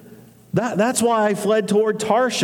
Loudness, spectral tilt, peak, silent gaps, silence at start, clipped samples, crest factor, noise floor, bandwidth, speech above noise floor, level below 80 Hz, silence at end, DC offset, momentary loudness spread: -19 LUFS; -4.5 dB/octave; -4 dBFS; none; 0.05 s; under 0.1%; 14 dB; -45 dBFS; 18 kHz; 27 dB; -64 dBFS; 0 s; under 0.1%; 5 LU